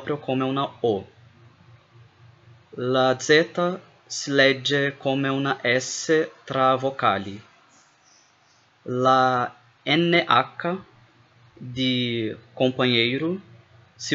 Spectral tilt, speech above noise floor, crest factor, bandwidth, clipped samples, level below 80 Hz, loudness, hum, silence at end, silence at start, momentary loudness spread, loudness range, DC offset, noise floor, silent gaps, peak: -4.5 dB/octave; 37 dB; 20 dB; 8.2 kHz; under 0.1%; -72 dBFS; -22 LUFS; none; 0 s; 0 s; 15 LU; 3 LU; under 0.1%; -60 dBFS; none; -4 dBFS